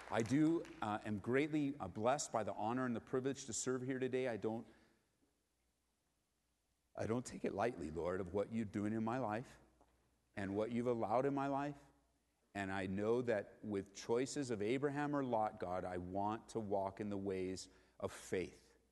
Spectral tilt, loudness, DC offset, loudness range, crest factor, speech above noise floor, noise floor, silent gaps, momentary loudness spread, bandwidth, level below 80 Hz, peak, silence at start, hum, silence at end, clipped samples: -5.5 dB/octave; -41 LUFS; under 0.1%; 5 LU; 20 dB; 44 dB; -84 dBFS; none; 9 LU; 12 kHz; -72 dBFS; -22 dBFS; 0 s; none; 0.35 s; under 0.1%